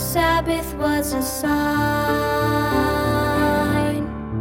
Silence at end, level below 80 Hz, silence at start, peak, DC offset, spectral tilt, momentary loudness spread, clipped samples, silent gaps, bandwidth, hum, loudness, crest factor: 0 s; -34 dBFS; 0 s; -6 dBFS; under 0.1%; -5 dB/octave; 4 LU; under 0.1%; none; 17 kHz; none; -20 LUFS; 14 dB